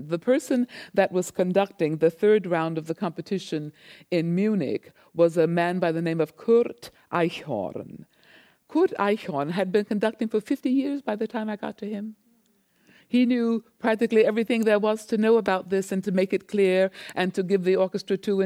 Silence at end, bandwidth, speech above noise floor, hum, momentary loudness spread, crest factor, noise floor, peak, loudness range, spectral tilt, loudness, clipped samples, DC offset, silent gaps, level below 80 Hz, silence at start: 0 s; 15.5 kHz; 41 dB; none; 10 LU; 16 dB; -65 dBFS; -8 dBFS; 4 LU; -6.5 dB/octave; -25 LUFS; under 0.1%; under 0.1%; none; -72 dBFS; 0 s